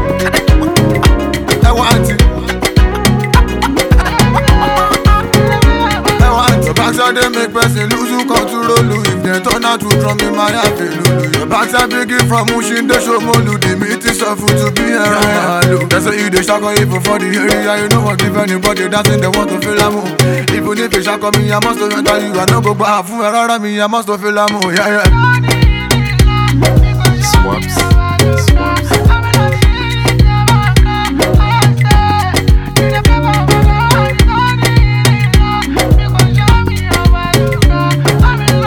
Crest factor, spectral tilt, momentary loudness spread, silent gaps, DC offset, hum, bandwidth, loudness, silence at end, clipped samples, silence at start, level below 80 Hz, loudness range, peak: 10 dB; -5 dB/octave; 4 LU; none; under 0.1%; none; over 20 kHz; -11 LUFS; 0 s; 0.5%; 0 s; -16 dBFS; 2 LU; 0 dBFS